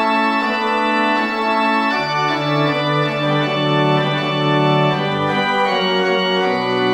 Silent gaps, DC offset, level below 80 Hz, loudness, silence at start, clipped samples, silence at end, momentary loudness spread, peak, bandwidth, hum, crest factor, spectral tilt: none; under 0.1%; -58 dBFS; -17 LUFS; 0 s; under 0.1%; 0 s; 2 LU; -4 dBFS; 9.4 kHz; none; 12 dB; -6 dB/octave